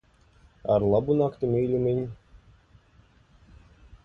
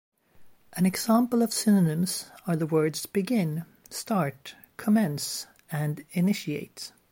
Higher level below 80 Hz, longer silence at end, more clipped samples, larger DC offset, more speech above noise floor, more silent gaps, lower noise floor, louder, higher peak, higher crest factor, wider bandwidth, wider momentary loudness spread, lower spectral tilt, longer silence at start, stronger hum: first, -52 dBFS vs -70 dBFS; first, 1.9 s vs 0.2 s; neither; neither; first, 35 dB vs 27 dB; neither; first, -59 dBFS vs -53 dBFS; about the same, -25 LUFS vs -27 LUFS; about the same, -10 dBFS vs -12 dBFS; about the same, 18 dB vs 16 dB; second, 5.8 kHz vs 16.5 kHz; second, 10 LU vs 14 LU; first, -11 dB/octave vs -5.5 dB/octave; first, 0.65 s vs 0.4 s; neither